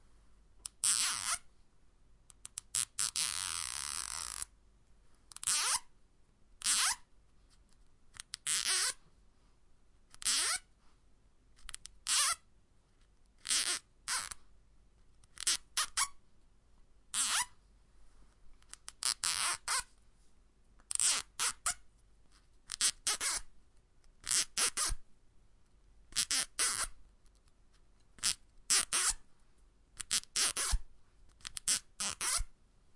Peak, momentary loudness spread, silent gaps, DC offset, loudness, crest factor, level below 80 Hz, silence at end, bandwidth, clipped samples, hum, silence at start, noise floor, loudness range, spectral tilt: -12 dBFS; 17 LU; none; under 0.1%; -33 LUFS; 28 dB; -54 dBFS; 0.45 s; 11.5 kHz; under 0.1%; none; 0.3 s; -66 dBFS; 3 LU; 1.5 dB/octave